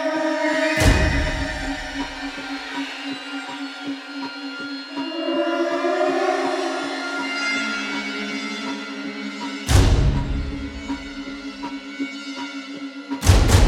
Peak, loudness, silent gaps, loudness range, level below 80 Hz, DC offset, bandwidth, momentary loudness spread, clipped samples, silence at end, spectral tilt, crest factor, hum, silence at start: -2 dBFS; -24 LUFS; none; 6 LU; -28 dBFS; under 0.1%; 16.5 kHz; 13 LU; under 0.1%; 0 s; -5 dB/octave; 20 dB; none; 0 s